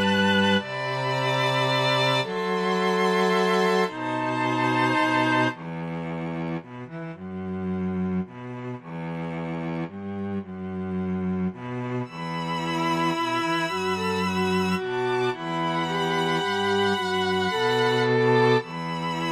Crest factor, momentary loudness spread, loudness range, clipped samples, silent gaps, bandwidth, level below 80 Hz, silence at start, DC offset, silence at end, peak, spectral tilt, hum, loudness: 16 dB; 11 LU; 8 LU; under 0.1%; none; 14 kHz; -64 dBFS; 0 s; under 0.1%; 0 s; -8 dBFS; -5.5 dB/octave; none; -25 LUFS